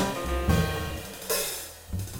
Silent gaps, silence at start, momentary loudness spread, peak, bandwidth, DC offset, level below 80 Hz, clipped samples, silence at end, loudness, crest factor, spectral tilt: none; 0 s; 11 LU; -10 dBFS; over 20 kHz; under 0.1%; -38 dBFS; under 0.1%; 0 s; -29 LUFS; 20 dB; -4.5 dB/octave